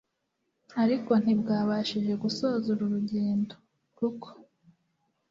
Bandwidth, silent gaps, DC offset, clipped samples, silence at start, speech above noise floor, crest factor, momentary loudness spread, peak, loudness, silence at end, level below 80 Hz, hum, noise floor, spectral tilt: 7.6 kHz; none; under 0.1%; under 0.1%; 0.7 s; 52 dB; 18 dB; 10 LU; -12 dBFS; -28 LUFS; 0.9 s; -70 dBFS; none; -79 dBFS; -7 dB/octave